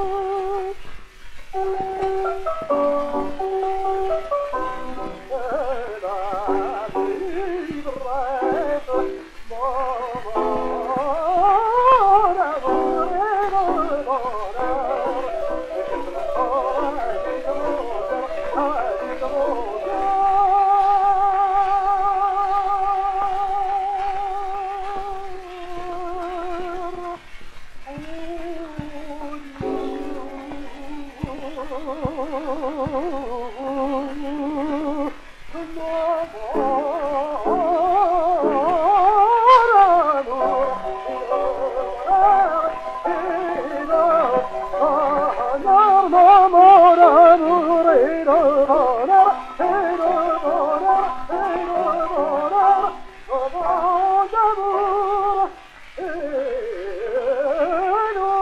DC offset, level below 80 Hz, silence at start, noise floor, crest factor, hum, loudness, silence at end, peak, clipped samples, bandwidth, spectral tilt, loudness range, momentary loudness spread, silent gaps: under 0.1%; -42 dBFS; 0 s; -40 dBFS; 18 dB; none; -19 LUFS; 0 s; 0 dBFS; under 0.1%; 10 kHz; -6 dB/octave; 15 LU; 16 LU; none